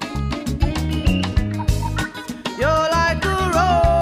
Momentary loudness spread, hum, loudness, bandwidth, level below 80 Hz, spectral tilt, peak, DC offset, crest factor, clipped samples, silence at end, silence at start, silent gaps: 8 LU; none; -20 LUFS; 16 kHz; -26 dBFS; -5.5 dB/octave; -6 dBFS; under 0.1%; 14 dB; under 0.1%; 0 s; 0 s; none